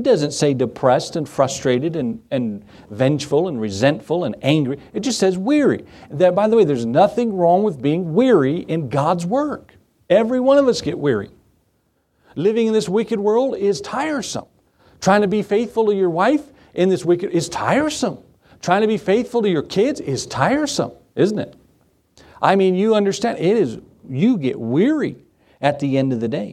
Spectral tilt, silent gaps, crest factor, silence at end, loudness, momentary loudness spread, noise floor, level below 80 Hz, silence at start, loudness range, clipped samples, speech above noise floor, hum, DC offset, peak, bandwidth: -6 dB/octave; none; 18 dB; 0 s; -18 LUFS; 9 LU; -65 dBFS; -56 dBFS; 0 s; 4 LU; under 0.1%; 47 dB; none; under 0.1%; 0 dBFS; 13.5 kHz